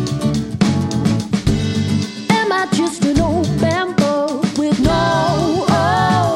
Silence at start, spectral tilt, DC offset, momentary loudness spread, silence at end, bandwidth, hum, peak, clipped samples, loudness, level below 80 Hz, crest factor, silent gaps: 0 s; -6 dB/octave; under 0.1%; 4 LU; 0 s; 15 kHz; none; -2 dBFS; under 0.1%; -16 LUFS; -34 dBFS; 14 dB; none